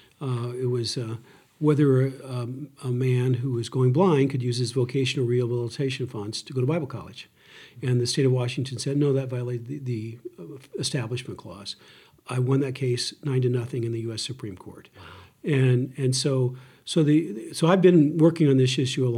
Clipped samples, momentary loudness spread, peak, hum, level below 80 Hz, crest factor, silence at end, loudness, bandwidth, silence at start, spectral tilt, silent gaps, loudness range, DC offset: under 0.1%; 17 LU; -6 dBFS; none; -72 dBFS; 18 dB; 0 s; -25 LUFS; 12 kHz; 0.2 s; -6.5 dB/octave; none; 7 LU; under 0.1%